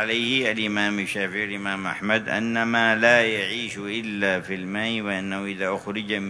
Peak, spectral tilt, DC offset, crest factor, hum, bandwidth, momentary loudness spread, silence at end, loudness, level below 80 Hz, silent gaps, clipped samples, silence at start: -4 dBFS; -4 dB/octave; under 0.1%; 20 dB; none; 11 kHz; 10 LU; 0 s; -23 LUFS; -64 dBFS; none; under 0.1%; 0 s